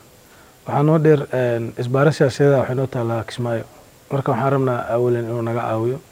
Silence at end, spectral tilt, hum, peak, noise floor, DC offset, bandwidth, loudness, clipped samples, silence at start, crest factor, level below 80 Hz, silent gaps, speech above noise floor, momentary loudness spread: 0.1 s; -7.5 dB/octave; none; -2 dBFS; -48 dBFS; under 0.1%; 16 kHz; -19 LUFS; under 0.1%; 0.65 s; 18 dB; -58 dBFS; none; 29 dB; 9 LU